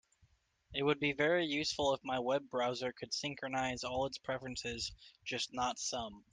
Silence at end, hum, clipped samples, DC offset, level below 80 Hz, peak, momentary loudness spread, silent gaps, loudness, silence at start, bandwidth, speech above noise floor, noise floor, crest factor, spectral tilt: 0.15 s; none; under 0.1%; under 0.1%; -64 dBFS; -18 dBFS; 9 LU; none; -37 LUFS; 0.7 s; 10.5 kHz; 35 dB; -72 dBFS; 20 dB; -3.5 dB/octave